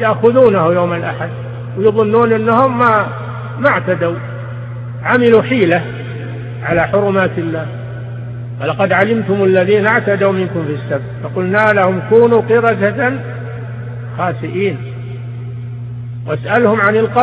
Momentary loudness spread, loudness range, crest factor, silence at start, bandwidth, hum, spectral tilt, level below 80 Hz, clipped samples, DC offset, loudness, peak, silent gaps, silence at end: 15 LU; 5 LU; 14 dB; 0 s; 4.9 kHz; none; -9 dB/octave; -48 dBFS; under 0.1%; under 0.1%; -13 LUFS; 0 dBFS; none; 0 s